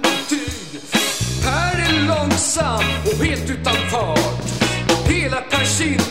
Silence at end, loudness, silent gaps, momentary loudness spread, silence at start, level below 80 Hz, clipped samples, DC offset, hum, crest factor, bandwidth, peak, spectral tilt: 0 s; -18 LUFS; none; 4 LU; 0 s; -32 dBFS; under 0.1%; 0.9%; none; 16 dB; 16 kHz; -2 dBFS; -3.5 dB/octave